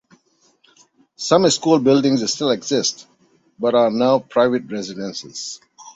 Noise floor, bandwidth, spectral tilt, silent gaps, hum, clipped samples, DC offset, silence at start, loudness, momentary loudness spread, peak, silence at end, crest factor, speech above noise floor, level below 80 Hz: -59 dBFS; 8.2 kHz; -4 dB/octave; none; none; under 0.1%; under 0.1%; 1.2 s; -18 LUFS; 14 LU; -2 dBFS; 0.05 s; 18 dB; 42 dB; -62 dBFS